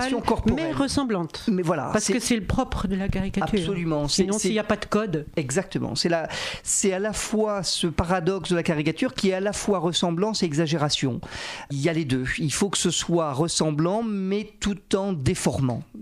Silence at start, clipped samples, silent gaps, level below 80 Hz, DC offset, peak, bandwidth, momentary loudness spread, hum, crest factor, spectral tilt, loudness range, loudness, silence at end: 0 s; under 0.1%; none; -42 dBFS; under 0.1%; -8 dBFS; 15 kHz; 4 LU; none; 16 dB; -4.5 dB/octave; 1 LU; -24 LUFS; 0 s